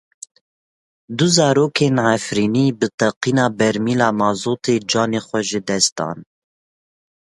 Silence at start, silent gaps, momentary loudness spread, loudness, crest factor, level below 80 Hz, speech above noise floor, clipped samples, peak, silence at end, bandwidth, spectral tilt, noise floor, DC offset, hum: 1.1 s; 2.94-2.98 s, 3.16-3.21 s, 5.92-5.96 s; 6 LU; -18 LUFS; 18 dB; -58 dBFS; over 73 dB; under 0.1%; 0 dBFS; 1.05 s; 11.5 kHz; -4.5 dB/octave; under -90 dBFS; under 0.1%; none